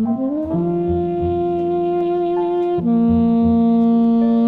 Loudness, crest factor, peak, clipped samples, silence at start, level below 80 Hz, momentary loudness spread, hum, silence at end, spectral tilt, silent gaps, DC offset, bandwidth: -17 LUFS; 10 dB; -6 dBFS; under 0.1%; 0 s; -40 dBFS; 5 LU; none; 0 s; -11 dB/octave; none; under 0.1%; 4.2 kHz